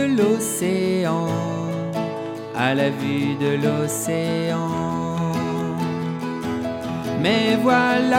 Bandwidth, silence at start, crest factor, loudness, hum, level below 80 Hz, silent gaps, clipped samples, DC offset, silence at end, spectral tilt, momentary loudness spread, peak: 16.5 kHz; 0 s; 16 dB; -22 LUFS; none; -56 dBFS; none; under 0.1%; under 0.1%; 0 s; -5.5 dB/octave; 8 LU; -4 dBFS